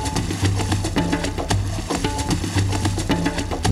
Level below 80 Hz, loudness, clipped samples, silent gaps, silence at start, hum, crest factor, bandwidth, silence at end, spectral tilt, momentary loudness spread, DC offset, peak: -30 dBFS; -22 LUFS; under 0.1%; none; 0 s; none; 16 dB; 14 kHz; 0 s; -5 dB/octave; 3 LU; under 0.1%; -4 dBFS